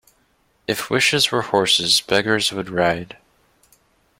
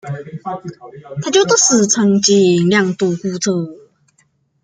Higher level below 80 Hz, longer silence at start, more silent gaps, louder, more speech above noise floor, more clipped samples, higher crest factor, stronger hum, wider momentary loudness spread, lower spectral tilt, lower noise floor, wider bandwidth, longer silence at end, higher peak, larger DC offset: about the same, -56 dBFS vs -60 dBFS; first, 0.7 s vs 0.05 s; neither; second, -18 LUFS vs -13 LUFS; about the same, 43 dB vs 45 dB; neither; about the same, 20 dB vs 16 dB; neither; second, 11 LU vs 17 LU; second, -2.5 dB/octave vs -4 dB/octave; about the same, -62 dBFS vs -60 dBFS; first, 16.5 kHz vs 10 kHz; first, 1.05 s vs 0.85 s; about the same, -2 dBFS vs 0 dBFS; neither